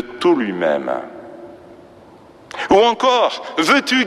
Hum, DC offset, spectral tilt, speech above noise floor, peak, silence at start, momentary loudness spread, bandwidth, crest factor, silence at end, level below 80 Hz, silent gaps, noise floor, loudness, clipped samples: none; under 0.1%; -3.5 dB/octave; 28 dB; -2 dBFS; 0 s; 21 LU; 14 kHz; 16 dB; 0 s; -56 dBFS; none; -44 dBFS; -16 LUFS; under 0.1%